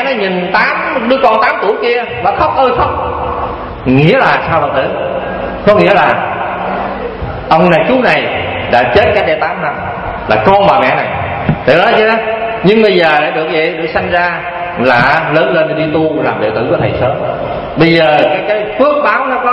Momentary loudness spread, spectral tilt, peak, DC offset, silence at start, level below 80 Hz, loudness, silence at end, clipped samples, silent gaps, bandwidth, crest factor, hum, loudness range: 9 LU; -7.5 dB/octave; 0 dBFS; under 0.1%; 0 s; -34 dBFS; -11 LUFS; 0 s; 0.3%; none; 8.2 kHz; 10 dB; none; 2 LU